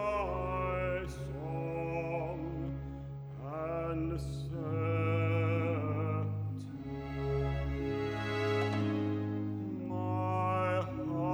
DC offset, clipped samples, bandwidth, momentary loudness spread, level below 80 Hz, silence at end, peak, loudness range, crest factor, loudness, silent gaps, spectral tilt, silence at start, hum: under 0.1%; under 0.1%; 10 kHz; 9 LU; -48 dBFS; 0 s; -22 dBFS; 4 LU; 14 dB; -35 LUFS; none; -8 dB/octave; 0 s; none